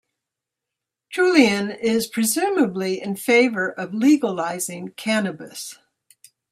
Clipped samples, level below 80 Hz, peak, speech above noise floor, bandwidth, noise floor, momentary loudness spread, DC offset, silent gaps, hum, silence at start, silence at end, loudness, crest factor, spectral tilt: under 0.1%; -68 dBFS; -2 dBFS; 64 dB; 16 kHz; -85 dBFS; 13 LU; under 0.1%; none; none; 1.1 s; 0.8 s; -20 LUFS; 20 dB; -4 dB/octave